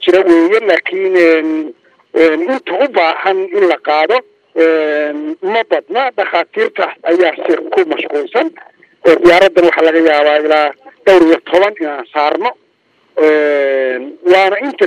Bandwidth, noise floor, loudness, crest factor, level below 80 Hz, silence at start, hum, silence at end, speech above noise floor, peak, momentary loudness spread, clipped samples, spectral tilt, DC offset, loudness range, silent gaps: 10 kHz; -55 dBFS; -12 LUFS; 12 dB; -54 dBFS; 0 s; none; 0 s; 44 dB; 0 dBFS; 9 LU; 0.4%; -4.5 dB/octave; under 0.1%; 4 LU; none